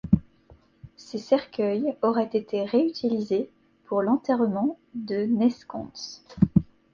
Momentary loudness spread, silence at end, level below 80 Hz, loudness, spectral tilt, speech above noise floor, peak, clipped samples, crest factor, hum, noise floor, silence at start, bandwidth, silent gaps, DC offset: 14 LU; 0.3 s; -50 dBFS; -25 LUFS; -8 dB/octave; 31 dB; -6 dBFS; under 0.1%; 20 dB; none; -56 dBFS; 0.05 s; 7.2 kHz; none; under 0.1%